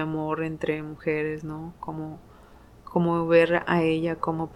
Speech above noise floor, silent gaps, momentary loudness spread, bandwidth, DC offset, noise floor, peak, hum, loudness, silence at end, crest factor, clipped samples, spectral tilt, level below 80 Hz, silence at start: 25 dB; none; 16 LU; 11.5 kHz; under 0.1%; -51 dBFS; -8 dBFS; none; -26 LUFS; 0 s; 18 dB; under 0.1%; -8 dB/octave; -54 dBFS; 0 s